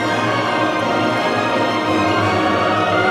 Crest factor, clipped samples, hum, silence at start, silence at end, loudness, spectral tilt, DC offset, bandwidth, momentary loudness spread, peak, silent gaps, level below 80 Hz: 12 dB; under 0.1%; none; 0 s; 0 s; -17 LUFS; -5 dB/octave; under 0.1%; 14 kHz; 2 LU; -4 dBFS; none; -54 dBFS